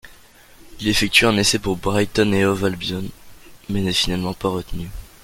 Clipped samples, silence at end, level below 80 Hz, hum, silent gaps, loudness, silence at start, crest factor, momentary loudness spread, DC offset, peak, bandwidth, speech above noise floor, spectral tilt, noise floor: under 0.1%; 0.15 s; -38 dBFS; none; none; -19 LUFS; 0.05 s; 20 dB; 15 LU; under 0.1%; 0 dBFS; 17 kHz; 28 dB; -4 dB/octave; -47 dBFS